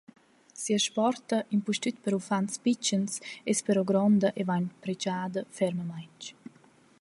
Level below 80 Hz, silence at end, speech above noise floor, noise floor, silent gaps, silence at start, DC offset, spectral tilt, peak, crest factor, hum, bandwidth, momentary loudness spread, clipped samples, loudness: -74 dBFS; 0.7 s; 31 dB; -60 dBFS; none; 0.55 s; under 0.1%; -4.5 dB/octave; -12 dBFS; 16 dB; none; 11.5 kHz; 13 LU; under 0.1%; -29 LUFS